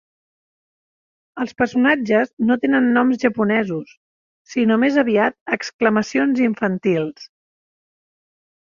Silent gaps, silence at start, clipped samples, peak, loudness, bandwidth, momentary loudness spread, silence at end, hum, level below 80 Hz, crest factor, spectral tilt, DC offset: 2.33-2.37 s, 3.97-4.45 s, 5.41-5.46 s, 5.73-5.79 s; 1.35 s; under 0.1%; -2 dBFS; -18 LUFS; 7.4 kHz; 10 LU; 1.4 s; none; -62 dBFS; 18 dB; -6 dB/octave; under 0.1%